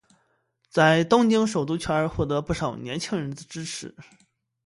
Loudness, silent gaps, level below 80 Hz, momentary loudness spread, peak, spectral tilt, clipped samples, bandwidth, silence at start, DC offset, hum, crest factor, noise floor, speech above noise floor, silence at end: -24 LUFS; none; -50 dBFS; 15 LU; -4 dBFS; -5.5 dB/octave; under 0.1%; 11.5 kHz; 0.75 s; under 0.1%; none; 20 dB; -70 dBFS; 46 dB; 0.65 s